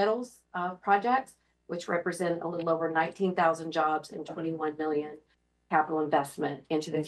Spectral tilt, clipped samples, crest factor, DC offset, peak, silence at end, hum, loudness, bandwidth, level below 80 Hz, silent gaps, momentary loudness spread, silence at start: -5.5 dB/octave; under 0.1%; 20 dB; under 0.1%; -10 dBFS; 0 s; none; -30 LUFS; 12.5 kHz; -76 dBFS; none; 9 LU; 0 s